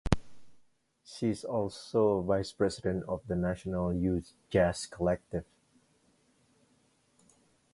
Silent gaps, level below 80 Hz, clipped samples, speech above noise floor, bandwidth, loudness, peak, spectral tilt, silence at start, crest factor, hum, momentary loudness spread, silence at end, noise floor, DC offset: none; -48 dBFS; under 0.1%; 39 dB; 11.5 kHz; -32 LUFS; -6 dBFS; -6.5 dB/octave; 0.05 s; 26 dB; none; 7 LU; 2.3 s; -70 dBFS; under 0.1%